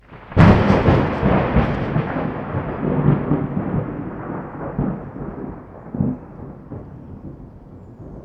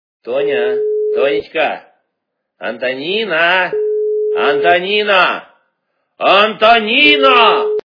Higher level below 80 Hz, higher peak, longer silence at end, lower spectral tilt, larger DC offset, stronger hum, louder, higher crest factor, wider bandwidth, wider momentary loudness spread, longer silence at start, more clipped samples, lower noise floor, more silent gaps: first, -32 dBFS vs -58 dBFS; about the same, 0 dBFS vs 0 dBFS; about the same, 0 s vs 0.05 s; first, -9 dB/octave vs -5 dB/octave; neither; neither; second, -19 LUFS vs -12 LUFS; first, 20 dB vs 14 dB; first, 6.8 kHz vs 5.4 kHz; first, 22 LU vs 11 LU; second, 0.1 s vs 0.25 s; neither; second, -40 dBFS vs -74 dBFS; neither